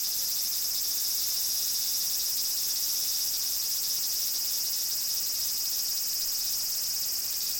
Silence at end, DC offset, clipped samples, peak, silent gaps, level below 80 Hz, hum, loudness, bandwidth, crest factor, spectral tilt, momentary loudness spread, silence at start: 0 s; under 0.1%; under 0.1%; -14 dBFS; none; -64 dBFS; none; -26 LUFS; over 20 kHz; 14 dB; 2.5 dB/octave; 1 LU; 0 s